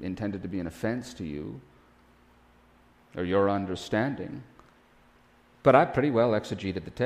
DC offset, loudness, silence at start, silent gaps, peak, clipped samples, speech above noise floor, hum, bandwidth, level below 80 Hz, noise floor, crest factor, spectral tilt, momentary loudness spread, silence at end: under 0.1%; -28 LUFS; 0 s; none; -6 dBFS; under 0.1%; 33 dB; none; 15 kHz; -56 dBFS; -60 dBFS; 24 dB; -7 dB/octave; 18 LU; 0 s